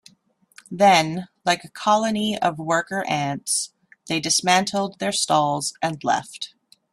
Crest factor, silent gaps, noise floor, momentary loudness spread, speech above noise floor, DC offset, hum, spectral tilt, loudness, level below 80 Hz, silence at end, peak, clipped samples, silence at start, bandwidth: 22 dB; none; -61 dBFS; 10 LU; 39 dB; under 0.1%; none; -3 dB/octave; -21 LUFS; -64 dBFS; 0.45 s; -2 dBFS; under 0.1%; 0.7 s; 15.5 kHz